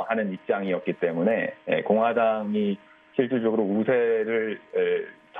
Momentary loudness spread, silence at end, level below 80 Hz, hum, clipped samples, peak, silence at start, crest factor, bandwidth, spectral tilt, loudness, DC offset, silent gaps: 6 LU; 0 s; -76 dBFS; none; under 0.1%; -8 dBFS; 0 s; 16 dB; 3.8 kHz; -9.5 dB/octave; -25 LUFS; under 0.1%; none